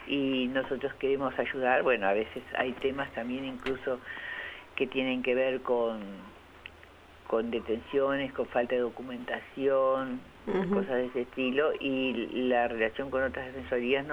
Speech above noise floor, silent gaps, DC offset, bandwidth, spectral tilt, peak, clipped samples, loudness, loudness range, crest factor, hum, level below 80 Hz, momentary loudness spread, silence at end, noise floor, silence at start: 23 dB; none; under 0.1%; 10.5 kHz; -6.5 dB/octave; -12 dBFS; under 0.1%; -31 LUFS; 3 LU; 18 dB; none; -58 dBFS; 11 LU; 0 s; -53 dBFS; 0 s